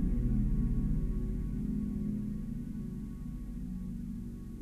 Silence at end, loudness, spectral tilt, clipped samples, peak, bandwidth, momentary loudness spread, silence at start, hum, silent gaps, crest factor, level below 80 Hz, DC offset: 0 s; -37 LUFS; -10 dB/octave; under 0.1%; -20 dBFS; 3 kHz; 10 LU; 0 s; none; none; 14 dB; -36 dBFS; under 0.1%